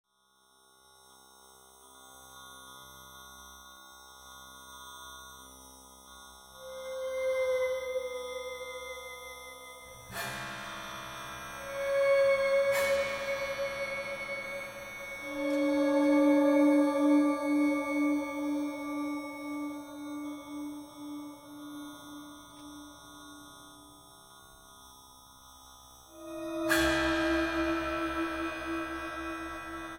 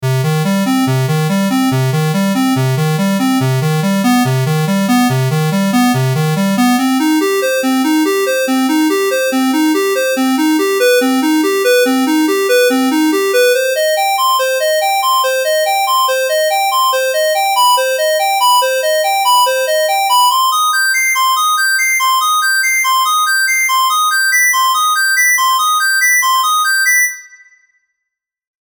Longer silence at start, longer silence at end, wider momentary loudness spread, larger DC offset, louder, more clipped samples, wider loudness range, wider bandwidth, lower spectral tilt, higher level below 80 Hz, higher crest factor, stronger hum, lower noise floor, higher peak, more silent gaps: first, 1.85 s vs 0 s; second, 0 s vs 1.5 s; first, 25 LU vs 4 LU; neither; second, -31 LUFS vs -12 LUFS; neither; first, 23 LU vs 3 LU; second, 17 kHz vs over 20 kHz; about the same, -4 dB/octave vs -4 dB/octave; first, -58 dBFS vs -68 dBFS; first, 18 dB vs 8 dB; neither; second, -68 dBFS vs -78 dBFS; second, -16 dBFS vs -4 dBFS; neither